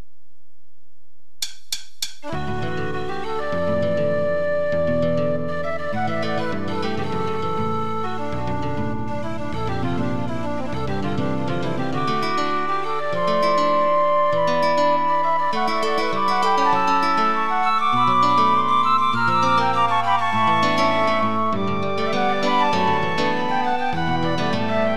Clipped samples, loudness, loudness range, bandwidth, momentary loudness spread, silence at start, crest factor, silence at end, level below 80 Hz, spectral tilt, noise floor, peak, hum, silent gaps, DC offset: under 0.1%; -21 LUFS; 8 LU; 14 kHz; 9 LU; 1.4 s; 16 dB; 0 s; -48 dBFS; -5.5 dB/octave; -67 dBFS; -6 dBFS; none; none; 5%